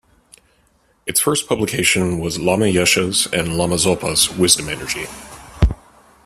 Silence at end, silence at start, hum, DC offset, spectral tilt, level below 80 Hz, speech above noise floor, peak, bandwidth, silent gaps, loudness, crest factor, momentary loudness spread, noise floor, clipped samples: 0.5 s; 1.05 s; none; under 0.1%; -3 dB/octave; -32 dBFS; 41 dB; 0 dBFS; 15.5 kHz; none; -17 LUFS; 20 dB; 11 LU; -58 dBFS; under 0.1%